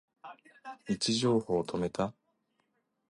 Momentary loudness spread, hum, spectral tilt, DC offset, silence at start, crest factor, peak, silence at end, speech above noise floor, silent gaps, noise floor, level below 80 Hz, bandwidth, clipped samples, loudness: 23 LU; none; -5 dB/octave; under 0.1%; 0.25 s; 18 dB; -18 dBFS; 1 s; 46 dB; none; -78 dBFS; -64 dBFS; 11.5 kHz; under 0.1%; -31 LUFS